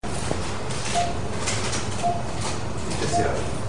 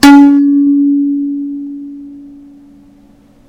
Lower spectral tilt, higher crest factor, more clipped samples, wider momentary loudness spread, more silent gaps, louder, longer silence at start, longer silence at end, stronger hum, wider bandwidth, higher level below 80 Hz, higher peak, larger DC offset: about the same, -4 dB/octave vs -3.5 dB/octave; first, 18 dB vs 10 dB; second, under 0.1% vs 2%; second, 5 LU vs 23 LU; neither; second, -26 LUFS vs -9 LUFS; about the same, 0 s vs 0 s; second, 0 s vs 1.2 s; neither; second, 10.5 kHz vs 16 kHz; about the same, -40 dBFS vs -44 dBFS; second, -8 dBFS vs 0 dBFS; first, 4% vs under 0.1%